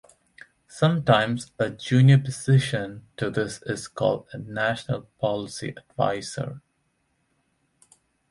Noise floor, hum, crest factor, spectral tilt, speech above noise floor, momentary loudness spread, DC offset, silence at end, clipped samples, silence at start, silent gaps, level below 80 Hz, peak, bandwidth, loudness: -72 dBFS; none; 20 dB; -6 dB/octave; 48 dB; 15 LU; under 0.1%; 1.7 s; under 0.1%; 0.7 s; none; -58 dBFS; -6 dBFS; 11.5 kHz; -24 LUFS